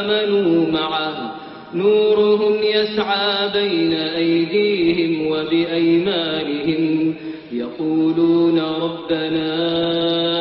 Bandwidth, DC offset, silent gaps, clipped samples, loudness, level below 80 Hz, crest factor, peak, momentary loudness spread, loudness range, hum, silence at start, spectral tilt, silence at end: 5.6 kHz; under 0.1%; none; under 0.1%; -18 LUFS; -56 dBFS; 12 dB; -6 dBFS; 8 LU; 2 LU; none; 0 s; -8.5 dB/octave; 0 s